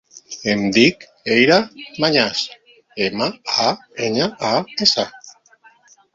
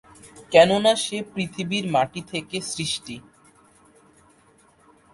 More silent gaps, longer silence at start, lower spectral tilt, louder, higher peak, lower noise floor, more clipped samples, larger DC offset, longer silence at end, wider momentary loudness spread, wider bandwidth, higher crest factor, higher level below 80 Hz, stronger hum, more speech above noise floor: neither; about the same, 0.15 s vs 0.25 s; about the same, -3.5 dB/octave vs -4 dB/octave; first, -18 LUFS vs -22 LUFS; about the same, 0 dBFS vs 0 dBFS; second, -52 dBFS vs -57 dBFS; neither; neither; second, 0.85 s vs 1.95 s; about the same, 14 LU vs 14 LU; second, 7.8 kHz vs 11.5 kHz; about the same, 20 dB vs 24 dB; about the same, -58 dBFS vs -60 dBFS; neither; about the same, 34 dB vs 35 dB